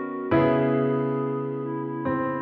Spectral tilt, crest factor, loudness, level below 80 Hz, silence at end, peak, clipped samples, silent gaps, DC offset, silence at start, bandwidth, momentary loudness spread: -11 dB/octave; 16 dB; -25 LUFS; -56 dBFS; 0 s; -8 dBFS; under 0.1%; none; under 0.1%; 0 s; 4.7 kHz; 8 LU